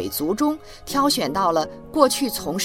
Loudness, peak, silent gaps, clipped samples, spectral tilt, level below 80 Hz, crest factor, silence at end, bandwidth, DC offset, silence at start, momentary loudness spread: -21 LUFS; 0 dBFS; none; under 0.1%; -3.5 dB/octave; -48 dBFS; 20 dB; 0 s; 17 kHz; under 0.1%; 0 s; 7 LU